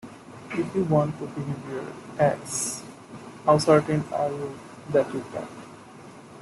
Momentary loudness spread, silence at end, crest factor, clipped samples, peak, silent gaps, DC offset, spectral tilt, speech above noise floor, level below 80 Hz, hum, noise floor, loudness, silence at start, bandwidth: 23 LU; 0 s; 20 dB; under 0.1%; -6 dBFS; none; under 0.1%; -5.5 dB/octave; 21 dB; -60 dBFS; none; -45 dBFS; -26 LUFS; 0.05 s; 12.5 kHz